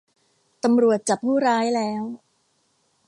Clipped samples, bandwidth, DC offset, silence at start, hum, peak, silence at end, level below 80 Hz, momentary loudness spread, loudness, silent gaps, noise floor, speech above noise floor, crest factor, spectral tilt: under 0.1%; 11.5 kHz; under 0.1%; 0.65 s; none; -8 dBFS; 0.9 s; -72 dBFS; 13 LU; -21 LUFS; none; -67 dBFS; 47 dB; 14 dB; -4.5 dB/octave